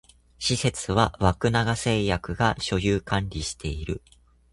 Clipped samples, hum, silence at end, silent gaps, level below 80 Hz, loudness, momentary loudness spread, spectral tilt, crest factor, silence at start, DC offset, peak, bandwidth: under 0.1%; none; 0.55 s; none; -40 dBFS; -25 LUFS; 9 LU; -5 dB/octave; 22 dB; 0.4 s; under 0.1%; -4 dBFS; 11.5 kHz